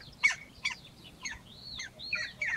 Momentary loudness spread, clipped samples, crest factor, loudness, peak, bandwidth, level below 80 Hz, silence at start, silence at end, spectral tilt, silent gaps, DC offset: 16 LU; under 0.1%; 22 dB; -34 LUFS; -14 dBFS; 16 kHz; -62 dBFS; 0 s; 0 s; -0.5 dB/octave; none; under 0.1%